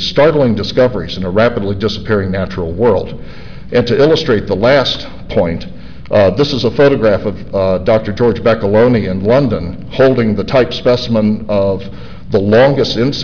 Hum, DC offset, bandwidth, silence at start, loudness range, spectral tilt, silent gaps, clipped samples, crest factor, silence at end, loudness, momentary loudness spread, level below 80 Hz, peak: none; 4%; 5.4 kHz; 0 s; 2 LU; -7 dB/octave; none; under 0.1%; 10 dB; 0 s; -13 LUFS; 9 LU; -34 dBFS; -2 dBFS